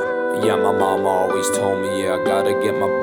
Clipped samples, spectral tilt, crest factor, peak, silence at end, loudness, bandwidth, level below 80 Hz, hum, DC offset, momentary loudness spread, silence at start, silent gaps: under 0.1%; -4 dB/octave; 14 dB; -4 dBFS; 0 s; -19 LUFS; 19 kHz; -62 dBFS; none; under 0.1%; 3 LU; 0 s; none